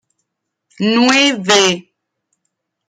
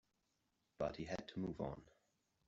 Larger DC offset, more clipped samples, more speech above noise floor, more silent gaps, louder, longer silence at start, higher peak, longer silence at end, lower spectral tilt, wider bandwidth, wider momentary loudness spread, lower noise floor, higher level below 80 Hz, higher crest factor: neither; neither; first, 62 dB vs 39 dB; neither; first, -12 LUFS vs -46 LUFS; about the same, 0.8 s vs 0.8 s; first, 0 dBFS vs -28 dBFS; first, 1.05 s vs 0.6 s; second, -2.5 dB/octave vs -6 dB/octave; first, 11.5 kHz vs 7.6 kHz; first, 9 LU vs 4 LU; second, -75 dBFS vs -85 dBFS; about the same, -64 dBFS vs -68 dBFS; about the same, 16 dB vs 20 dB